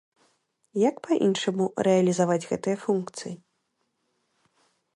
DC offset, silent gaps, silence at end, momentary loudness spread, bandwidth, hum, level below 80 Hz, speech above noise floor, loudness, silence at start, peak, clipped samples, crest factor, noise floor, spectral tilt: under 0.1%; none; 1.6 s; 14 LU; 11.5 kHz; none; -72 dBFS; 51 dB; -25 LUFS; 0.75 s; -10 dBFS; under 0.1%; 18 dB; -76 dBFS; -5.5 dB/octave